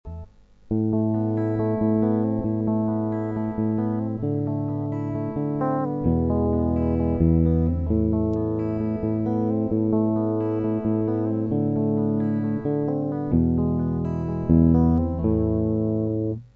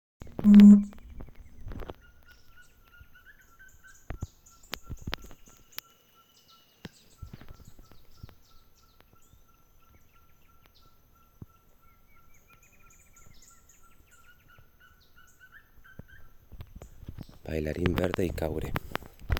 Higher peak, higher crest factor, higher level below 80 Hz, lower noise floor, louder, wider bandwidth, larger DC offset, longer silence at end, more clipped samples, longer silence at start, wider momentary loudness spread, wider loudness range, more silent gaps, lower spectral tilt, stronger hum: about the same, -6 dBFS vs -6 dBFS; second, 16 dB vs 24 dB; first, -36 dBFS vs -48 dBFS; second, -45 dBFS vs -61 dBFS; about the same, -23 LUFS vs -23 LUFS; second, 3.1 kHz vs 16 kHz; neither; about the same, 0.1 s vs 0 s; neither; second, 0.05 s vs 0.25 s; second, 6 LU vs 33 LU; second, 3 LU vs 31 LU; neither; first, -12.5 dB/octave vs -7.5 dB/octave; neither